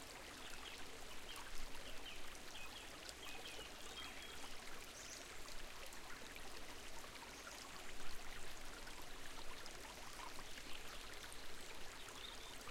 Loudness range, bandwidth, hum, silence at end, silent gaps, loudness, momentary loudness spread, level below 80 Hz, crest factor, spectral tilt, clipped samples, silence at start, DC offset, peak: 1 LU; 16.5 kHz; none; 0 s; none; -53 LUFS; 2 LU; -58 dBFS; 18 dB; -1.5 dB/octave; under 0.1%; 0 s; under 0.1%; -30 dBFS